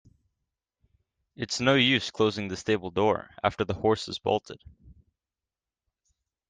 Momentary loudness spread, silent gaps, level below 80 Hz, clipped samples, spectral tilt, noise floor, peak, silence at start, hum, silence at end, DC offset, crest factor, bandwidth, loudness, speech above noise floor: 11 LU; none; -60 dBFS; under 0.1%; -4.5 dB/octave; under -90 dBFS; -8 dBFS; 1.4 s; none; 1.55 s; under 0.1%; 22 dB; 9.6 kHz; -26 LUFS; over 63 dB